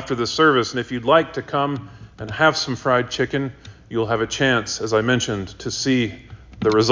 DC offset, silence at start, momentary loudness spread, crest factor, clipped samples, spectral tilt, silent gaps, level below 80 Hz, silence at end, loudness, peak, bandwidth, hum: under 0.1%; 0 s; 10 LU; 20 dB; under 0.1%; -4.5 dB/octave; none; -48 dBFS; 0 s; -20 LUFS; -2 dBFS; 7.6 kHz; none